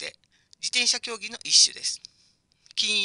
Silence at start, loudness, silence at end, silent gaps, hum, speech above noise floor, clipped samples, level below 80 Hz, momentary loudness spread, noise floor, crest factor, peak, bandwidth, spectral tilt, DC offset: 0 s; -22 LUFS; 0 s; none; none; 40 dB; under 0.1%; -74 dBFS; 16 LU; -64 dBFS; 22 dB; -4 dBFS; 11.5 kHz; 2.5 dB/octave; under 0.1%